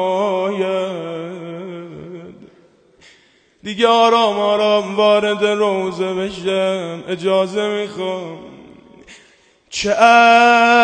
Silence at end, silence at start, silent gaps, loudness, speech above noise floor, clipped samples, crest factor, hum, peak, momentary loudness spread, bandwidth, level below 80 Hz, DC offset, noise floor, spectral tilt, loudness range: 0 s; 0 s; none; -15 LUFS; 39 dB; under 0.1%; 16 dB; none; 0 dBFS; 21 LU; 9.4 kHz; -58 dBFS; under 0.1%; -54 dBFS; -4 dB/octave; 8 LU